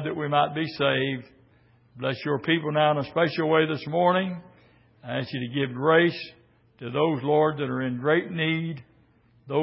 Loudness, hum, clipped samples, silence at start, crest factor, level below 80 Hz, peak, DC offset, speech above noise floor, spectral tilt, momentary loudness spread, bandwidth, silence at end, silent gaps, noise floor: -25 LUFS; none; under 0.1%; 0 s; 20 dB; -66 dBFS; -6 dBFS; under 0.1%; 35 dB; -10.5 dB/octave; 11 LU; 5.8 kHz; 0 s; none; -60 dBFS